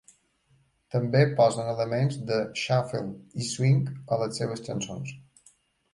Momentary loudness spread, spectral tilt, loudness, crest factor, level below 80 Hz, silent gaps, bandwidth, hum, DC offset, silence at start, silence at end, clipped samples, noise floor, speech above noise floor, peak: 11 LU; -6 dB/octave; -27 LUFS; 18 dB; -64 dBFS; none; 11.5 kHz; none; under 0.1%; 0.95 s; 0.75 s; under 0.1%; -66 dBFS; 40 dB; -10 dBFS